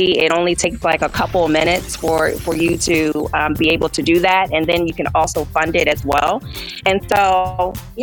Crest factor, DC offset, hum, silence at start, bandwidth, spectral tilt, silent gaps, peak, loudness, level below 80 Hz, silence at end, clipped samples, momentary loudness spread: 16 dB; under 0.1%; none; 0 s; 19 kHz; -4 dB/octave; none; 0 dBFS; -16 LUFS; -36 dBFS; 0 s; under 0.1%; 5 LU